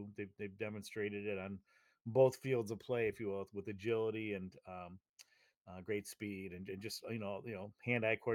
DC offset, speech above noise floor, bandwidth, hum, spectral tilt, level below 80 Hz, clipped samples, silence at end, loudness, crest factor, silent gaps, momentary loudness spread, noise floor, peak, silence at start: under 0.1%; 27 dB; 18 kHz; none; -6 dB/octave; -80 dBFS; under 0.1%; 0 s; -40 LUFS; 22 dB; 5.57-5.65 s; 16 LU; -67 dBFS; -18 dBFS; 0 s